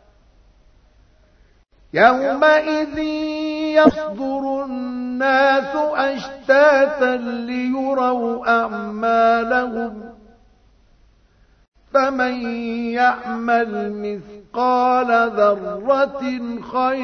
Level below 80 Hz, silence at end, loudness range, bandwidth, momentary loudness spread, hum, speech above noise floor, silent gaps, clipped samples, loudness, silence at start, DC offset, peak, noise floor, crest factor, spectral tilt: -52 dBFS; 0 s; 5 LU; 6.6 kHz; 11 LU; none; 36 dB; 11.68-11.72 s; under 0.1%; -18 LUFS; 1.95 s; under 0.1%; 0 dBFS; -54 dBFS; 20 dB; -5.5 dB/octave